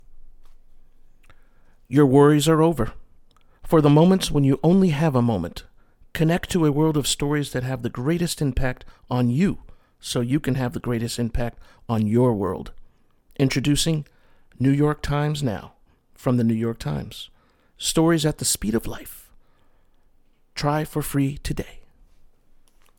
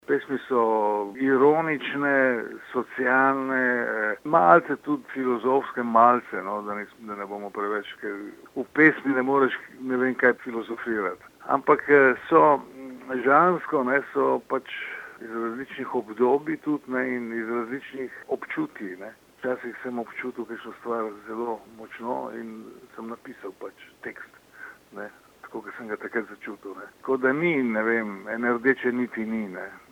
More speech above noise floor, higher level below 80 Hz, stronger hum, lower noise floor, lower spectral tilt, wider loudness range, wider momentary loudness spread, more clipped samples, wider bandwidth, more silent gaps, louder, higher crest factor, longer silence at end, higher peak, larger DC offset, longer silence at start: first, 36 dB vs 21 dB; first, -40 dBFS vs -72 dBFS; neither; first, -57 dBFS vs -46 dBFS; about the same, -6 dB/octave vs -7 dB/octave; second, 6 LU vs 15 LU; second, 17 LU vs 20 LU; neither; first, 18.5 kHz vs 16 kHz; neither; about the same, -22 LUFS vs -24 LUFS; about the same, 20 dB vs 24 dB; first, 1.2 s vs 0.15 s; about the same, -4 dBFS vs -2 dBFS; neither; about the same, 0.1 s vs 0.1 s